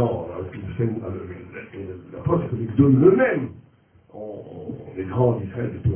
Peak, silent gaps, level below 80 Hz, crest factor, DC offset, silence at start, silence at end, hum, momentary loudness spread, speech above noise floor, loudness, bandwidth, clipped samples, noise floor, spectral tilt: -4 dBFS; none; -44 dBFS; 20 dB; under 0.1%; 0 s; 0 s; none; 20 LU; 33 dB; -22 LUFS; 3.4 kHz; under 0.1%; -55 dBFS; -13 dB/octave